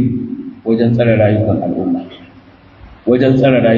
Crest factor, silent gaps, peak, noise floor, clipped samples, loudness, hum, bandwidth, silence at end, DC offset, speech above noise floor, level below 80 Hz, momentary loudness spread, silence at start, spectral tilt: 14 dB; none; 0 dBFS; -42 dBFS; under 0.1%; -14 LUFS; none; 5.4 kHz; 0 s; under 0.1%; 30 dB; -44 dBFS; 13 LU; 0 s; -10 dB/octave